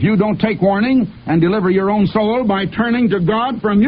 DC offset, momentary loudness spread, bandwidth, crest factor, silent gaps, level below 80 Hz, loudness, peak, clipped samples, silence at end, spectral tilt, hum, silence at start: under 0.1%; 3 LU; 5.2 kHz; 12 dB; none; -44 dBFS; -15 LUFS; -2 dBFS; under 0.1%; 0 s; -11.5 dB/octave; none; 0 s